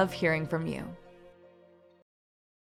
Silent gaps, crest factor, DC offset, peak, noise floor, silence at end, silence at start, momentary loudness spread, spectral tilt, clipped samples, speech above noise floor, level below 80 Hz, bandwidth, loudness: none; 24 dB; under 0.1%; -10 dBFS; -59 dBFS; 1.3 s; 0 s; 18 LU; -6.5 dB/octave; under 0.1%; 29 dB; -62 dBFS; 15 kHz; -31 LUFS